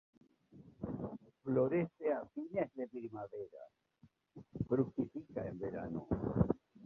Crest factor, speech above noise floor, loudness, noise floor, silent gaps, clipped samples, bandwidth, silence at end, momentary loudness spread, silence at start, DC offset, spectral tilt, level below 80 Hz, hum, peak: 22 dB; 31 dB; -39 LUFS; -70 dBFS; none; under 0.1%; 4.1 kHz; 0 s; 13 LU; 0.55 s; under 0.1%; -10.5 dB/octave; -58 dBFS; none; -18 dBFS